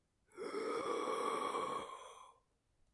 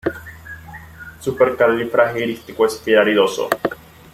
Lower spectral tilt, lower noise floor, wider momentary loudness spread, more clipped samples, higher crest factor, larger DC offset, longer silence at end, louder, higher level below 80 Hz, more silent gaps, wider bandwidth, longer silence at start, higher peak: second, -3 dB/octave vs -4.5 dB/octave; first, -77 dBFS vs -37 dBFS; second, 17 LU vs 21 LU; neither; about the same, 18 dB vs 18 dB; neither; first, 0.65 s vs 0.4 s; second, -41 LUFS vs -18 LUFS; second, -82 dBFS vs -52 dBFS; neither; second, 11.5 kHz vs 16 kHz; first, 0.35 s vs 0.05 s; second, -26 dBFS vs 0 dBFS